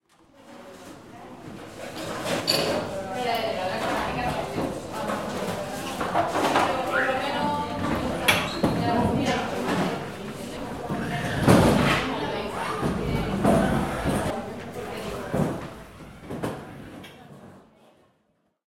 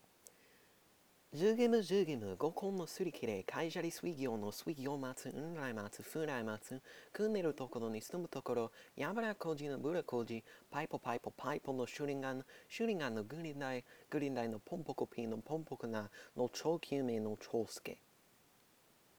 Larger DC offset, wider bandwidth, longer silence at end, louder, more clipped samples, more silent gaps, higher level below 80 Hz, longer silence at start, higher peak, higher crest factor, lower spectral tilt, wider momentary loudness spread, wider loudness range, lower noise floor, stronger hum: first, 0.2% vs under 0.1%; second, 16.5 kHz vs over 20 kHz; second, 1.05 s vs 1.2 s; first, -26 LUFS vs -41 LUFS; neither; neither; first, -44 dBFS vs -82 dBFS; about the same, 0.35 s vs 0.25 s; first, -4 dBFS vs -22 dBFS; about the same, 24 dB vs 20 dB; about the same, -5 dB/octave vs -5.5 dB/octave; first, 20 LU vs 9 LU; first, 8 LU vs 4 LU; about the same, -70 dBFS vs -70 dBFS; neither